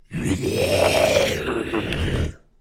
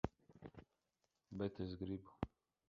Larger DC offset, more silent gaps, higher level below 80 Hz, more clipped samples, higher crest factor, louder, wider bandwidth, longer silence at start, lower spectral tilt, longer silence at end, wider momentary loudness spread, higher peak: neither; neither; first, -36 dBFS vs -62 dBFS; neither; second, 16 dB vs 28 dB; first, -21 LUFS vs -48 LUFS; first, 16 kHz vs 7.2 kHz; about the same, 0.1 s vs 0.05 s; second, -4.5 dB/octave vs -7 dB/octave; second, 0.25 s vs 0.4 s; second, 8 LU vs 15 LU; first, -4 dBFS vs -22 dBFS